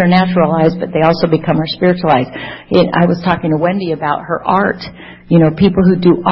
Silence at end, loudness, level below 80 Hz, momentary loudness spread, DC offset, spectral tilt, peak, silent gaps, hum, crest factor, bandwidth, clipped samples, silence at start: 0 s; -13 LUFS; -42 dBFS; 7 LU; under 0.1%; -9.5 dB/octave; 0 dBFS; none; none; 12 dB; 5.8 kHz; under 0.1%; 0 s